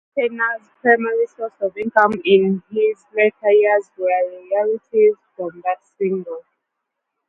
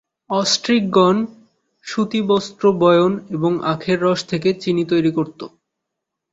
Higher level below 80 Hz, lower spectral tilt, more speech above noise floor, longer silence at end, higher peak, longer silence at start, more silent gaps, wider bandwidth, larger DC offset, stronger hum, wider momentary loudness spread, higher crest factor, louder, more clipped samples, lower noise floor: second, -68 dBFS vs -58 dBFS; first, -7.5 dB/octave vs -5.5 dB/octave; about the same, 60 dB vs 63 dB; about the same, 0.9 s vs 0.85 s; about the same, 0 dBFS vs -2 dBFS; second, 0.15 s vs 0.3 s; neither; second, 4.1 kHz vs 8 kHz; neither; neither; about the same, 10 LU vs 12 LU; about the same, 18 dB vs 16 dB; about the same, -19 LUFS vs -18 LUFS; neither; about the same, -78 dBFS vs -80 dBFS